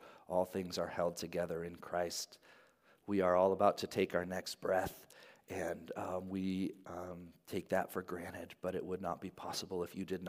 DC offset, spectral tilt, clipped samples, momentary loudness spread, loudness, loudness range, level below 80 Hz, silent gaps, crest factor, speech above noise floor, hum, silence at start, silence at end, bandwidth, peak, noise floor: under 0.1%; -5 dB/octave; under 0.1%; 14 LU; -39 LUFS; 6 LU; -74 dBFS; none; 22 dB; 30 dB; none; 0 s; 0 s; 15.5 kHz; -16 dBFS; -68 dBFS